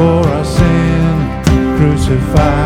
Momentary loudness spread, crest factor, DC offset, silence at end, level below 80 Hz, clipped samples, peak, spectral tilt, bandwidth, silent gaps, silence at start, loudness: 2 LU; 10 dB; under 0.1%; 0 s; -20 dBFS; 0.2%; 0 dBFS; -7 dB/octave; 15 kHz; none; 0 s; -12 LUFS